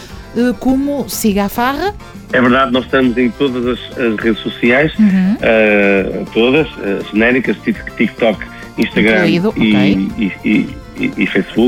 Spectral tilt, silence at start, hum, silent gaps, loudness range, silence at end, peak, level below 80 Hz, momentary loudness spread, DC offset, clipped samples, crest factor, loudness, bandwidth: -6 dB/octave; 0 s; none; none; 2 LU; 0 s; -2 dBFS; -36 dBFS; 9 LU; under 0.1%; under 0.1%; 12 dB; -14 LUFS; 19.5 kHz